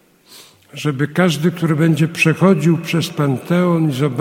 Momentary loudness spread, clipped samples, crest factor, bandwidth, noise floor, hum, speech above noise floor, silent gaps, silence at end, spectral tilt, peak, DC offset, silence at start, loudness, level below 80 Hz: 7 LU; under 0.1%; 16 dB; 16 kHz; -44 dBFS; none; 29 dB; none; 0 s; -6.5 dB/octave; 0 dBFS; under 0.1%; 0.3 s; -16 LUFS; -60 dBFS